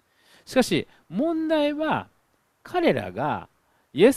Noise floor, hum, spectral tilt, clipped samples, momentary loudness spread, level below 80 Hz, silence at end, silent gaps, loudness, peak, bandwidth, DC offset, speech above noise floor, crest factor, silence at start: -67 dBFS; none; -5.5 dB/octave; under 0.1%; 8 LU; -58 dBFS; 0 s; none; -25 LUFS; -4 dBFS; 15 kHz; under 0.1%; 43 dB; 20 dB; 0.5 s